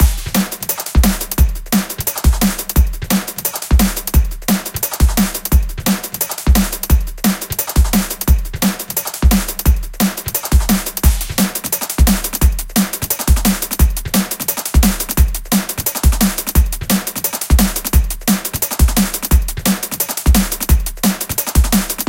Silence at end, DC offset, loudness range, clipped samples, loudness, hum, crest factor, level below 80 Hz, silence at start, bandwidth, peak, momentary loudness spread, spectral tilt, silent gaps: 0 s; under 0.1%; 1 LU; under 0.1%; -16 LUFS; none; 14 dB; -18 dBFS; 0 s; 17.5 kHz; 0 dBFS; 4 LU; -4.5 dB/octave; none